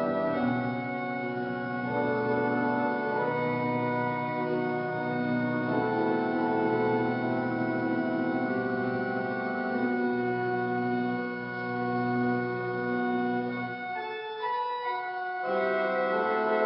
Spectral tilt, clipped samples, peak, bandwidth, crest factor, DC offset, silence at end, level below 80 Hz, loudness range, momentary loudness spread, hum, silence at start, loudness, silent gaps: -10.5 dB/octave; under 0.1%; -14 dBFS; 5.6 kHz; 14 dB; under 0.1%; 0 s; -68 dBFS; 2 LU; 5 LU; none; 0 s; -29 LUFS; none